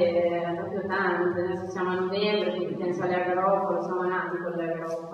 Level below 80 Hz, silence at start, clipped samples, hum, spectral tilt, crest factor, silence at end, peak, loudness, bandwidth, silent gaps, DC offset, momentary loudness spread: -68 dBFS; 0 s; under 0.1%; none; -6.5 dB/octave; 14 dB; 0 s; -12 dBFS; -27 LUFS; 7 kHz; none; under 0.1%; 6 LU